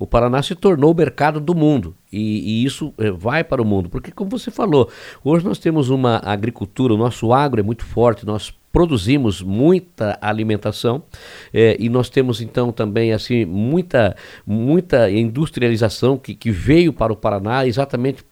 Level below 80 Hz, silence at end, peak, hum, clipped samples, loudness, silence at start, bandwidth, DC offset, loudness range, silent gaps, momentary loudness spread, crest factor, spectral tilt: -38 dBFS; 0.15 s; 0 dBFS; none; under 0.1%; -18 LUFS; 0 s; 16 kHz; under 0.1%; 2 LU; none; 9 LU; 16 dB; -7 dB/octave